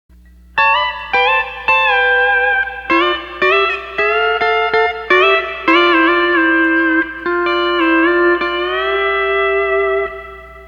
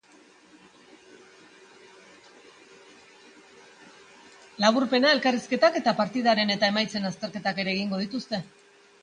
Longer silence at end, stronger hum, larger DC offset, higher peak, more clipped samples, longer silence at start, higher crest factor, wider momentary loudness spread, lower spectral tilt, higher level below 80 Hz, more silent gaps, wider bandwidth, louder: second, 0 s vs 0.6 s; neither; neither; first, 0 dBFS vs -6 dBFS; neither; second, 0.55 s vs 4.6 s; second, 14 dB vs 22 dB; second, 6 LU vs 11 LU; about the same, -4.5 dB/octave vs -4.5 dB/octave; first, -44 dBFS vs -72 dBFS; neither; second, 7 kHz vs 10 kHz; first, -13 LUFS vs -25 LUFS